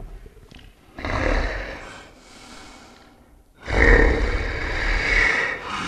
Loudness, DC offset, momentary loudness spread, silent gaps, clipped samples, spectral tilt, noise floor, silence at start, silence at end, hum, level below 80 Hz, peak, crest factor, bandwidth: -21 LUFS; under 0.1%; 25 LU; none; under 0.1%; -5 dB/octave; -52 dBFS; 0 s; 0 s; none; -26 dBFS; 0 dBFS; 22 dB; 9.8 kHz